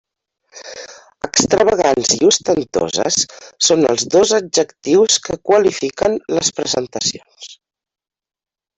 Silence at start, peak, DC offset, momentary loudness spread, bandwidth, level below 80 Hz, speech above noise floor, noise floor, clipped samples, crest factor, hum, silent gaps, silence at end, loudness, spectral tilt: 0.55 s; 0 dBFS; under 0.1%; 19 LU; 8.4 kHz; -52 dBFS; over 74 dB; under -90 dBFS; under 0.1%; 16 dB; none; none; 1.25 s; -15 LUFS; -2.5 dB/octave